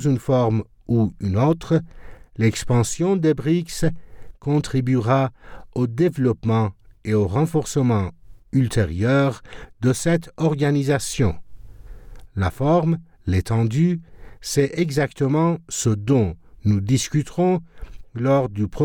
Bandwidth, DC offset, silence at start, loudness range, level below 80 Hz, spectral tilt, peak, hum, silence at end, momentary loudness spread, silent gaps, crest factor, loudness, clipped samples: 18.5 kHz; under 0.1%; 0 s; 2 LU; -42 dBFS; -6.5 dB/octave; -6 dBFS; none; 0 s; 7 LU; none; 14 dB; -21 LUFS; under 0.1%